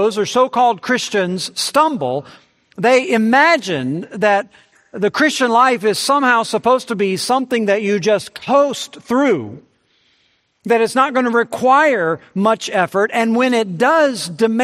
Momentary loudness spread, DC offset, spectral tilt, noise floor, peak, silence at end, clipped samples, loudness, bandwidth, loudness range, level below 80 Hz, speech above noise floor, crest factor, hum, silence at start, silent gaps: 8 LU; under 0.1%; -4 dB/octave; -61 dBFS; 0 dBFS; 0 s; under 0.1%; -15 LUFS; 14.5 kHz; 3 LU; -66 dBFS; 45 dB; 16 dB; none; 0 s; none